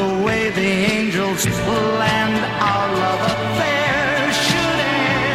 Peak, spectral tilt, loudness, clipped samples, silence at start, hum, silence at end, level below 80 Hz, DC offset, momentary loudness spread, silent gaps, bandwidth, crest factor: -2 dBFS; -4 dB/octave; -17 LUFS; under 0.1%; 0 s; none; 0 s; -44 dBFS; 0.1%; 3 LU; none; 16 kHz; 16 dB